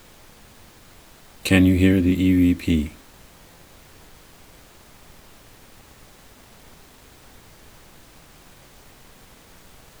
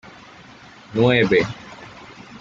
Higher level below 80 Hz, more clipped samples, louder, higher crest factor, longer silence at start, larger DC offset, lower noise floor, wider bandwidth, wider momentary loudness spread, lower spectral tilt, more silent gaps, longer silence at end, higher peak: first, -44 dBFS vs -54 dBFS; neither; about the same, -19 LUFS vs -18 LUFS; first, 26 dB vs 20 dB; first, 1.45 s vs 0.9 s; neither; first, -49 dBFS vs -44 dBFS; first, over 20 kHz vs 7.6 kHz; second, 10 LU vs 24 LU; about the same, -6.5 dB/octave vs -6.5 dB/octave; neither; first, 7.1 s vs 0.05 s; first, 0 dBFS vs -4 dBFS